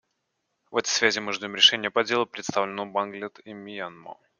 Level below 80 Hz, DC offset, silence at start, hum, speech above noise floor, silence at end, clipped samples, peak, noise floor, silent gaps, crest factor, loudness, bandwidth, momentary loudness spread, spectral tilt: -70 dBFS; under 0.1%; 0.7 s; none; 52 dB; 0.25 s; under 0.1%; -2 dBFS; -78 dBFS; none; 24 dB; -23 LUFS; 10 kHz; 20 LU; -1.5 dB/octave